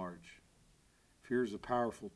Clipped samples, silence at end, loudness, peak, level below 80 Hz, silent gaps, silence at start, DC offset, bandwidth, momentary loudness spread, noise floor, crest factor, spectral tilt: under 0.1%; 0.05 s; -38 LUFS; -22 dBFS; -68 dBFS; none; 0 s; under 0.1%; 11 kHz; 19 LU; -69 dBFS; 18 dB; -6.5 dB/octave